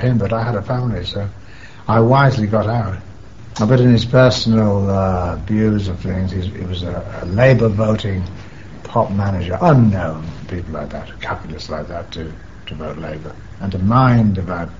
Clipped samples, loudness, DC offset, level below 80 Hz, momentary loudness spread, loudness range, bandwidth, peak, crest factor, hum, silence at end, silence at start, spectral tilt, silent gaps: under 0.1%; -17 LUFS; 1%; -36 dBFS; 17 LU; 8 LU; 7.6 kHz; 0 dBFS; 16 dB; none; 0 s; 0 s; -6.5 dB/octave; none